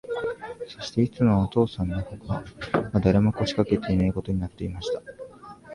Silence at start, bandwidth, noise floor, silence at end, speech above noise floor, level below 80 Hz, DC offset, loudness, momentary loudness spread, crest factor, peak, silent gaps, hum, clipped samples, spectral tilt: 0.05 s; 11 kHz; -44 dBFS; 0 s; 19 dB; -42 dBFS; under 0.1%; -26 LUFS; 15 LU; 18 dB; -6 dBFS; none; none; under 0.1%; -7.5 dB/octave